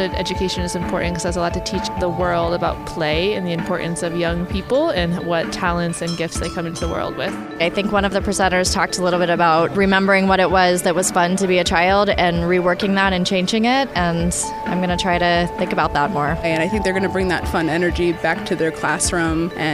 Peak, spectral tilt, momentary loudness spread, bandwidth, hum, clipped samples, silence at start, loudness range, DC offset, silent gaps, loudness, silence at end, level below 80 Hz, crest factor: -2 dBFS; -4.5 dB/octave; 7 LU; 15.5 kHz; none; under 0.1%; 0 s; 5 LU; under 0.1%; none; -18 LUFS; 0 s; -34 dBFS; 16 dB